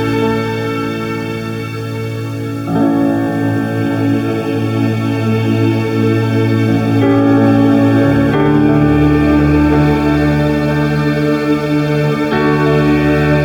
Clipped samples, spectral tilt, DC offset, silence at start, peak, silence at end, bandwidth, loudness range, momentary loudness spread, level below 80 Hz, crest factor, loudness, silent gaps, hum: under 0.1%; -8 dB/octave; under 0.1%; 0 s; 0 dBFS; 0 s; 18.5 kHz; 6 LU; 9 LU; -30 dBFS; 12 dB; -13 LUFS; none; none